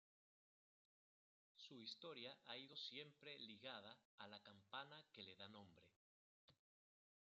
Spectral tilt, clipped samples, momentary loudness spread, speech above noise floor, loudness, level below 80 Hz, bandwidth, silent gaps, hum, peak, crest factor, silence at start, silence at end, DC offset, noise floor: -1 dB/octave; under 0.1%; 9 LU; over 30 dB; -58 LUFS; under -90 dBFS; 7.4 kHz; 4.05-4.18 s, 5.96-6.48 s; none; -40 dBFS; 22 dB; 1.55 s; 0.7 s; under 0.1%; under -90 dBFS